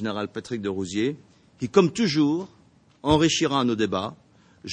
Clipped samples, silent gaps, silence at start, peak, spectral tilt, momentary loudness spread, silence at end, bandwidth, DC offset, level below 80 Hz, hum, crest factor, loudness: under 0.1%; none; 0 s; -4 dBFS; -5 dB/octave; 15 LU; 0 s; 9.4 kHz; under 0.1%; -52 dBFS; none; 22 dB; -24 LUFS